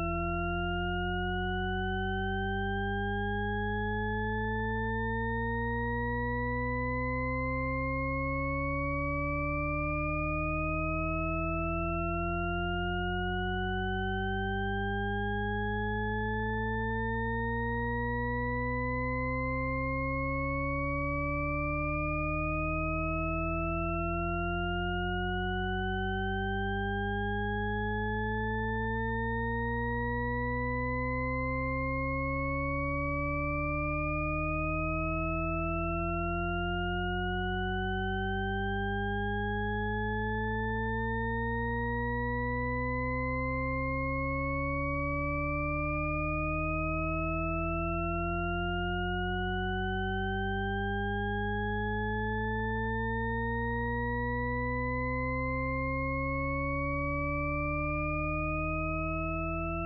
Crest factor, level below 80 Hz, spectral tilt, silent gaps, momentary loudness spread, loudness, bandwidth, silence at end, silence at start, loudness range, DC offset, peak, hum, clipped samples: 10 dB; -40 dBFS; -5 dB/octave; none; 1 LU; -32 LUFS; 5 kHz; 0 s; 0 s; 1 LU; under 0.1%; -22 dBFS; none; under 0.1%